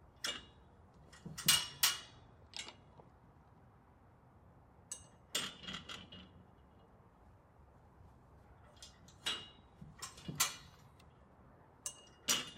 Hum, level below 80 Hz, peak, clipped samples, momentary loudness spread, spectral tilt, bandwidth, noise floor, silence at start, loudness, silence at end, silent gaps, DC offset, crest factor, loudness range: none; -68 dBFS; -16 dBFS; under 0.1%; 26 LU; -0.5 dB/octave; 16 kHz; -64 dBFS; 0 s; -38 LUFS; 0 s; none; under 0.1%; 30 dB; 16 LU